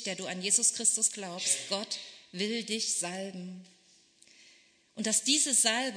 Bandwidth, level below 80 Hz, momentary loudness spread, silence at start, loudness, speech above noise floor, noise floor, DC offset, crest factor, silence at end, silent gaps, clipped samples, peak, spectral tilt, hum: 11 kHz; -86 dBFS; 15 LU; 0 s; -28 LUFS; 32 dB; -63 dBFS; under 0.1%; 20 dB; 0 s; none; under 0.1%; -12 dBFS; -1 dB/octave; none